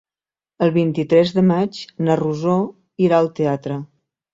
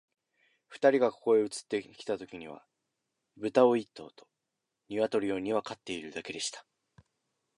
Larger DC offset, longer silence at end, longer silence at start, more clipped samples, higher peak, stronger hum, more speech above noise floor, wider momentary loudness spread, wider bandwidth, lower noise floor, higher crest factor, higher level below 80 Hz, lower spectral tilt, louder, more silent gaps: neither; second, 0.5 s vs 0.95 s; about the same, 0.6 s vs 0.7 s; neither; first, -2 dBFS vs -10 dBFS; neither; first, over 73 dB vs 56 dB; second, 9 LU vs 19 LU; second, 7.8 kHz vs 11.5 kHz; first, under -90 dBFS vs -86 dBFS; second, 16 dB vs 22 dB; first, -60 dBFS vs -74 dBFS; first, -8 dB/octave vs -4 dB/octave; first, -19 LUFS vs -31 LUFS; neither